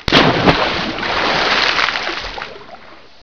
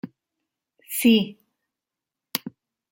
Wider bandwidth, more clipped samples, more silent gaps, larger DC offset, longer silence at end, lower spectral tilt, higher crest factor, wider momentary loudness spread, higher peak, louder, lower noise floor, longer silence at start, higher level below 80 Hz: second, 5.4 kHz vs 17 kHz; neither; neither; first, 0.9% vs under 0.1%; about the same, 0.3 s vs 0.4 s; about the same, -4.5 dB/octave vs -4 dB/octave; second, 16 dB vs 22 dB; second, 16 LU vs 21 LU; first, 0 dBFS vs -4 dBFS; first, -14 LUFS vs -23 LUFS; second, -39 dBFS vs -87 dBFS; about the same, 0 s vs 0.05 s; first, -36 dBFS vs -70 dBFS